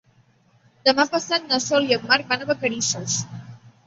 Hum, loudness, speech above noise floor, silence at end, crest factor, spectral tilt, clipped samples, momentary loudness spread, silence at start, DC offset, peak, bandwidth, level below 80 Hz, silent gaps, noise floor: none; -21 LUFS; 37 dB; 0.2 s; 22 dB; -2.5 dB/octave; under 0.1%; 7 LU; 0.85 s; under 0.1%; -2 dBFS; 8.2 kHz; -64 dBFS; none; -59 dBFS